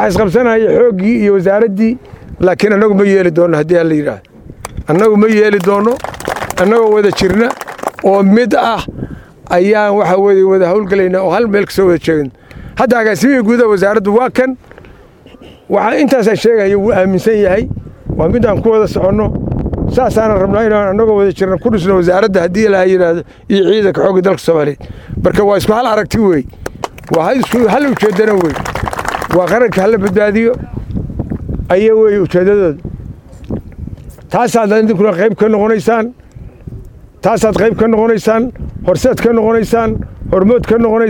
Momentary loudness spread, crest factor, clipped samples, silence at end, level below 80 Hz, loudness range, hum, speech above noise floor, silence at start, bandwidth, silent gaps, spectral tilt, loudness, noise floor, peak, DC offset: 12 LU; 10 dB; under 0.1%; 0 s; -32 dBFS; 2 LU; none; 28 dB; 0 s; 18 kHz; none; -6.5 dB/octave; -11 LUFS; -38 dBFS; 0 dBFS; under 0.1%